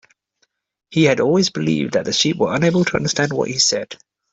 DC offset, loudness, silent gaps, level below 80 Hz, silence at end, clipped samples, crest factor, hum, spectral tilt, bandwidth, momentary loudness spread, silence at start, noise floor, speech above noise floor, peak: under 0.1%; -17 LUFS; none; -54 dBFS; 0.4 s; under 0.1%; 16 dB; none; -4 dB/octave; 8.4 kHz; 7 LU; 0.9 s; -67 dBFS; 50 dB; -2 dBFS